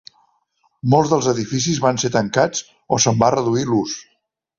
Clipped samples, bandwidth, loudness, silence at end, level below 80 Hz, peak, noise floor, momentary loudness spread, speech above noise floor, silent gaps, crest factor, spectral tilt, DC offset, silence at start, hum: under 0.1%; 7.6 kHz; -18 LUFS; 0.55 s; -54 dBFS; -2 dBFS; -65 dBFS; 10 LU; 47 dB; none; 18 dB; -4.5 dB/octave; under 0.1%; 0.85 s; none